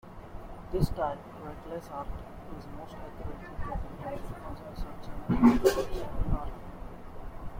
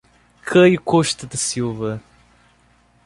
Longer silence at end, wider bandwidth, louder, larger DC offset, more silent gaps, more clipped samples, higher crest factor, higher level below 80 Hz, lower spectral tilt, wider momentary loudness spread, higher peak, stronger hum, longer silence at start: second, 0 s vs 1.05 s; first, 16.5 kHz vs 11.5 kHz; second, -32 LUFS vs -18 LUFS; neither; neither; neither; about the same, 22 dB vs 18 dB; first, -40 dBFS vs -54 dBFS; first, -7 dB/octave vs -4.5 dB/octave; first, 21 LU vs 15 LU; second, -8 dBFS vs -2 dBFS; neither; second, 0.05 s vs 0.45 s